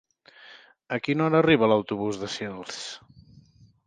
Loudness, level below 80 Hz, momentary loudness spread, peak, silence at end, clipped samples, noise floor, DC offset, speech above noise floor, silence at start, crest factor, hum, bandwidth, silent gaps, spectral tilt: -25 LUFS; -62 dBFS; 16 LU; -6 dBFS; 0.9 s; under 0.1%; -56 dBFS; under 0.1%; 31 dB; 0.4 s; 20 dB; none; 9.6 kHz; none; -5.5 dB/octave